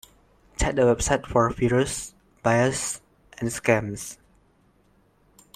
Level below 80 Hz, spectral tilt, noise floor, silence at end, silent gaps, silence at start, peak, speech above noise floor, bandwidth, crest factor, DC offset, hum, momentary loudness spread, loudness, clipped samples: -42 dBFS; -5 dB/octave; -62 dBFS; 1.4 s; none; 0.6 s; -4 dBFS; 39 dB; 15 kHz; 22 dB; under 0.1%; none; 15 LU; -24 LUFS; under 0.1%